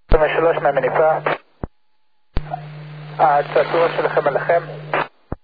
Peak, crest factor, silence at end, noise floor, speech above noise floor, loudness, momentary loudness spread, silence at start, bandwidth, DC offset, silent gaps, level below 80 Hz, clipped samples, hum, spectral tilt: 0 dBFS; 18 dB; 0.05 s; -71 dBFS; 54 dB; -18 LUFS; 18 LU; 0.1 s; 5 kHz; under 0.1%; none; -30 dBFS; under 0.1%; none; -9 dB/octave